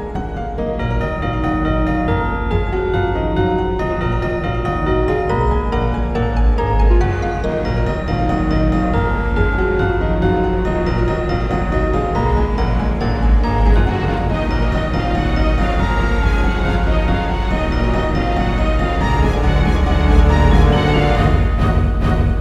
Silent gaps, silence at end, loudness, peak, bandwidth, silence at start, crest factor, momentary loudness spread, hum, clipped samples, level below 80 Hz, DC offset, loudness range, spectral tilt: none; 0 s; -17 LUFS; 0 dBFS; 7.8 kHz; 0 s; 16 dB; 5 LU; none; under 0.1%; -18 dBFS; under 0.1%; 4 LU; -8 dB/octave